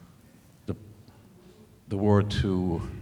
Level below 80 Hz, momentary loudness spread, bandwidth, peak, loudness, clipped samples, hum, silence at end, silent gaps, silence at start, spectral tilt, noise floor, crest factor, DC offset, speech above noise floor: -48 dBFS; 16 LU; 11.5 kHz; -8 dBFS; -27 LUFS; under 0.1%; none; 0 s; none; 0.7 s; -7.5 dB/octave; -55 dBFS; 22 dB; under 0.1%; 30 dB